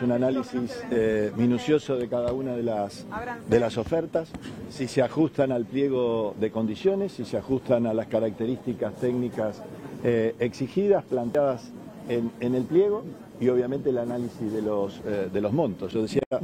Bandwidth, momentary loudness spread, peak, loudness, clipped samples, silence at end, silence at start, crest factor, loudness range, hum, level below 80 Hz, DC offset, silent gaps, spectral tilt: 15 kHz; 8 LU; -8 dBFS; -27 LUFS; under 0.1%; 0 s; 0 s; 18 dB; 2 LU; none; -56 dBFS; under 0.1%; 16.26-16.31 s; -7.5 dB/octave